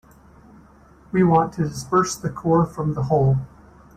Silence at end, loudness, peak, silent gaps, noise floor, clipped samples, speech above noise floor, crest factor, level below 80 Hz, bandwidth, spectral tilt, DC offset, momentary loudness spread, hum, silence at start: 0.5 s; -21 LUFS; -6 dBFS; none; -50 dBFS; under 0.1%; 30 dB; 16 dB; -46 dBFS; 15.5 kHz; -7 dB/octave; under 0.1%; 8 LU; none; 1.15 s